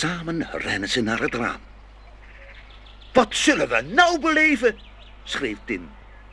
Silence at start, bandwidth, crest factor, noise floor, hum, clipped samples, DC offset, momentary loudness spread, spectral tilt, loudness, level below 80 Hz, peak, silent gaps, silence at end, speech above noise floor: 0 s; 12.5 kHz; 22 dB; -45 dBFS; none; under 0.1%; under 0.1%; 13 LU; -3.5 dB/octave; -21 LUFS; -46 dBFS; -2 dBFS; none; 0 s; 23 dB